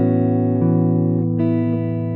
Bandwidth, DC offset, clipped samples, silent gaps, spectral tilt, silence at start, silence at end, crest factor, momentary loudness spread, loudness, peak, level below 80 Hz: 3.9 kHz; under 0.1%; under 0.1%; none; -14 dB/octave; 0 s; 0 s; 12 dB; 3 LU; -18 LUFS; -6 dBFS; -54 dBFS